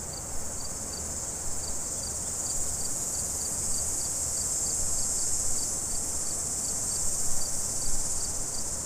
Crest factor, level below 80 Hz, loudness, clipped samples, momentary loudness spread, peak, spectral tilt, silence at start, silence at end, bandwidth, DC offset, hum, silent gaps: 16 dB; -40 dBFS; -28 LUFS; under 0.1%; 6 LU; -14 dBFS; -1.5 dB/octave; 0 s; 0 s; 16 kHz; under 0.1%; none; none